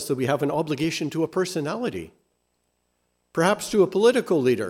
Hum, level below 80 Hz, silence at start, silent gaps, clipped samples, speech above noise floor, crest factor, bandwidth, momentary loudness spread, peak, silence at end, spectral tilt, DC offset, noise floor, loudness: 60 Hz at -55 dBFS; -62 dBFS; 0 s; none; under 0.1%; 50 dB; 18 dB; 16 kHz; 10 LU; -6 dBFS; 0 s; -5 dB/octave; under 0.1%; -73 dBFS; -23 LUFS